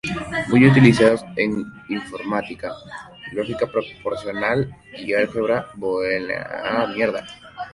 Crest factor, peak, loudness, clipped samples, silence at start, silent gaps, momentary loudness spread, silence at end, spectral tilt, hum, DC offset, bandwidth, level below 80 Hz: 20 dB; 0 dBFS; -20 LUFS; under 0.1%; 0.05 s; none; 18 LU; 0.05 s; -7 dB/octave; none; under 0.1%; 11.5 kHz; -50 dBFS